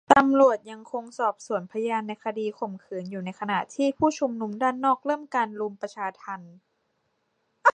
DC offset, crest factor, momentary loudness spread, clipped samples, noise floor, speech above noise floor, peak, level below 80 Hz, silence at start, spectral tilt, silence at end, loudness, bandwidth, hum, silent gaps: under 0.1%; 26 dB; 15 LU; under 0.1%; -74 dBFS; 47 dB; 0 dBFS; -66 dBFS; 0.1 s; -5 dB/octave; 0.05 s; -26 LUFS; 9.4 kHz; none; none